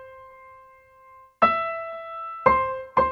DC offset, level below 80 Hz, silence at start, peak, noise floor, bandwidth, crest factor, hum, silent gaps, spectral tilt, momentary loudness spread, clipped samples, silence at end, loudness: under 0.1%; -50 dBFS; 0 s; -2 dBFS; -52 dBFS; 5.8 kHz; 24 dB; none; none; -7 dB/octave; 13 LU; under 0.1%; 0 s; -24 LUFS